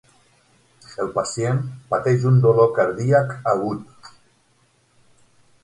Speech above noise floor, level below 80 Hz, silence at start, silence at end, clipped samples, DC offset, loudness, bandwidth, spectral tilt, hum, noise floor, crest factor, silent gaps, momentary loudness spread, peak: 42 dB; -58 dBFS; 0.9 s; 1.55 s; under 0.1%; under 0.1%; -20 LUFS; 11 kHz; -7 dB/octave; none; -61 dBFS; 18 dB; none; 12 LU; -4 dBFS